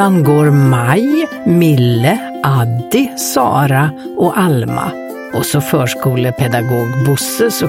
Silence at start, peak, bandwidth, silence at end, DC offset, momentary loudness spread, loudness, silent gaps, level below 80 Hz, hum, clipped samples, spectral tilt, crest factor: 0 s; 0 dBFS; 16.5 kHz; 0 s; under 0.1%; 6 LU; -13 LUFS; none; -48 dBFS; none; under 0.1%; -6 dB/octave; 12 dB